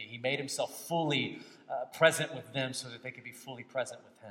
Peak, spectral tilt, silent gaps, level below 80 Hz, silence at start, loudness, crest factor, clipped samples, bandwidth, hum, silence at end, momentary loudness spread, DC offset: -10 dBFS; -3.5 dB/octave; none; -84 dBFS; 0 s; -33 LUFS; 26 dB; under 0.1%; 16.5 kHz; none; 0 s; 18 LU; under 0.1%